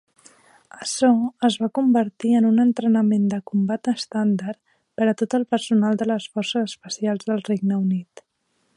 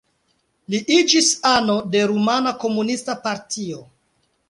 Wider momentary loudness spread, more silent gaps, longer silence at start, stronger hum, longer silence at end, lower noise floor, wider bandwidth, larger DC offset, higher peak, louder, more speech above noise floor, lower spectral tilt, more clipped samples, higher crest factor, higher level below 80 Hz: second, 8 LU vs 13 LU; neither; about the same, 0.75 s vs 0.7 s; neither; about the same, 0.75 s vs 0.65 s; about the same, -69 dBFS vs -67 dBFS; about the same, 11.5 kHz vs 11.5 kHz; neither; second, -6 dBFS vs -2 dBFS; about the same, -21 LUFS vs -19 LUFS; about the same, 49 dB vs 48 dB; first, -5.5 dB/octave vs -3 dB/octave; neither; about the same, 16 dB vs 18 dB; second, -70 dBFS vs -60 dBFS